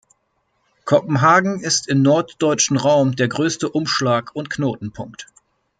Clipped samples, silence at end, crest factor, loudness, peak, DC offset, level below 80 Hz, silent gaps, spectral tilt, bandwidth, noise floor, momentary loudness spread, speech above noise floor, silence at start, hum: under 0.1%; 0.55 s; 18 dB; -18 LUFS; -2 dBFS; under 0.1%; -60 dBFS; none; -4.5 dB/octave; 9.4 kHz; -68 dBFS; 16 LU; 50 dB; 0.85 s; none